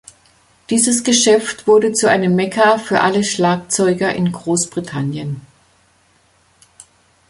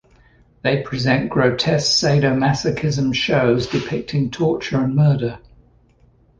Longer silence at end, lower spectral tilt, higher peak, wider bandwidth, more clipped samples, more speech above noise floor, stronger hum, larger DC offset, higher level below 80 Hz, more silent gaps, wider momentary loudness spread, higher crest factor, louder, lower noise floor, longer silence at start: first, 1.9 s vs 1 s; second, -4 dB/octave vs -5.5 dB/octave; about the same, 0 dBFS vs -2 dBFS; first, 11.5 kHz vs 9.6 kHz; neither; first, 40 dB vs 36 dB; neither; neither; second, -56 dBFS vs -46 dBFS; neither; first, 10 LU vs 7 LU; about the same, 16 dB vs 16 dB; first, -15 LUFS vs -18 LUFS; about the same, -56 dBFS vs -54 dBFS; about the same, 0.7 s vs 0.65 s